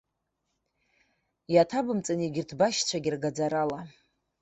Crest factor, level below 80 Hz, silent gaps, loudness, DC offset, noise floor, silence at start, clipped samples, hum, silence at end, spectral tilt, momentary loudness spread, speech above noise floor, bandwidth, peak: 22 dB; -68 dBFS; none; -28 LUFS; under 0.1%; -81 dBFS; 1.5 s; under 0.1%; none; 0.55 s; -4.5 dB/octave; 8 LU; 53 dB; 8.4 kHz; -8 dBFS